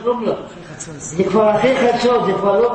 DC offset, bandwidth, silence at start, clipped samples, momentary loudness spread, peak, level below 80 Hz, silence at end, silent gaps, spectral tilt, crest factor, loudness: under 0.1%; 8.8 kHz; 0 s; under 0.1%; 17 LU; -2 dBFS; -48 dBFS; 0 s; none; -5 dB/octave; 14 dB; -16 LUFS